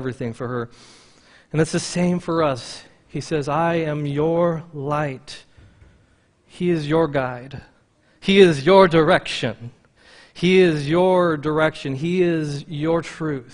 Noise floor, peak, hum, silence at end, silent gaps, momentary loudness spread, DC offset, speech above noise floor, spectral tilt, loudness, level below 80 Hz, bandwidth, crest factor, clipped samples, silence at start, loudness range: -58 dBFS; 0 dBFS; none; 0 s; none; 20 LU; under 0.1%; 39 dB; -6 dB/octave; -20 LUFS; -52 dBFS; 10.5 kHz; 20 dB; under 0.1%; 0 s; 7 LU